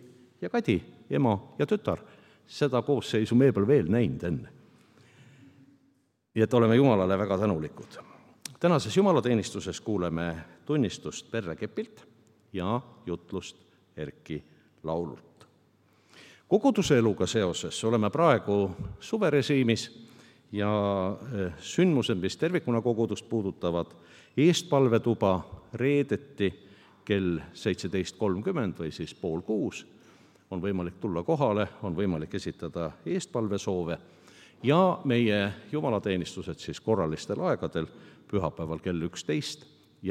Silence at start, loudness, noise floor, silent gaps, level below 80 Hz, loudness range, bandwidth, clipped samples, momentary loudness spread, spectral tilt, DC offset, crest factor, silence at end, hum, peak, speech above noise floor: 0 s; -28 LUFS; -69 dBFS; none; -62 dBFS; 7 LU; 14.5 kHz; under 0.1%; 15 LU; -6 dB/octave; under 0.1%; 22 dB; 0 s; none; -6 dBFS; 42 dB